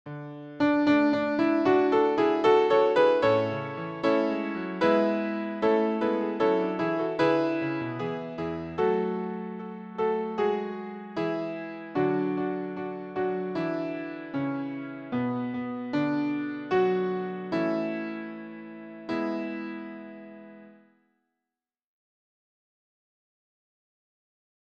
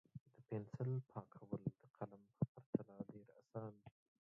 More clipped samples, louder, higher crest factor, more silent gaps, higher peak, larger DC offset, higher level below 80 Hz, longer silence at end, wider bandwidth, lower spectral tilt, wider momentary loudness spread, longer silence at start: neither; first, -27 LUFS vs -49 LUFS; second, 18 dB vs 24 dB; second, none vs 0.20-0.26 s, 1.90-1.94 s, 2.48-2.55 s, 2.66-2.73 s; first, -10 dBFS vs -26 dBFS; neither; first, -66 dBFS vs -80 dBFS; first, 3.9 s vs 0.45 s; first, 7.6 kHz vs 3 kHz; second, -7.5 dB/octave vs -11.5 dB/octave; about the same, 15 LU vs 17 LU; about the same, 0.05 s vs 0.15 s